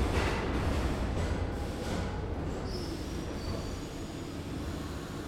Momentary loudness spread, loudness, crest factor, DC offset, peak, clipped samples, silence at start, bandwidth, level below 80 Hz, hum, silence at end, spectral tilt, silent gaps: 8 LU; -35 LUFS; 16 dB; under 0.1%; -16 dBFS; under 0.1%; 0 s; 16 kHz; -38 dBFS; none; 0 s; -6 dB/octave; none